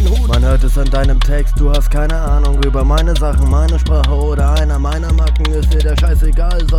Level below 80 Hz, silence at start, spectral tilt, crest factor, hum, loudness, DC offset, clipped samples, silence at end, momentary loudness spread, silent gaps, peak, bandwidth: -12 dBFS; 0 s; -6.5 dB/octave; 10 dB; none; -14 LUFS; under 0.1%; under 0.1%; 0 s; 3 LU; none; 0 dBFS; 13 kHz